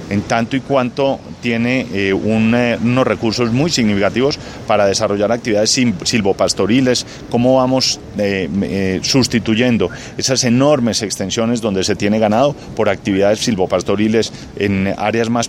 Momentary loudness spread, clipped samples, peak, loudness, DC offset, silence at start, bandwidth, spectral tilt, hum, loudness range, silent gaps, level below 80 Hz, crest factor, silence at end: 5 LU; under 0.1%; 0 dBFS; -15 LUFS; under 0.1%; 0 s; 15 kHz; -4.5 dB/octave; none; 1 LU; none; -44 dBFS; 14 dB; 0 s